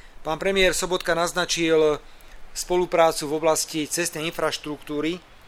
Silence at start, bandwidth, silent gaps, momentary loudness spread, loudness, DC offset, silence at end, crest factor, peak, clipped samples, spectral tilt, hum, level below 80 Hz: 0.05 s; 17.5 kHz; none; 11 LU; -23 LUFS; under 0.1%; 0 s; 20 dB; -4 dBFS; under 0.1%; -3 dB/octave; none; -44 dBFS